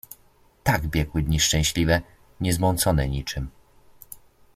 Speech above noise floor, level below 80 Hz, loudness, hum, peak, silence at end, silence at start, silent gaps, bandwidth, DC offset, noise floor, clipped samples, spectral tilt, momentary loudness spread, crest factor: 35 dB; -36 dBFS; -23 LUFS; none; -4 dBFS; 0.35 s; 0.65 s; none; 16 kHz; under 0.1%; -58 dBFS; under 0.1%; -4 dB/octave; 23 LU; 22 dB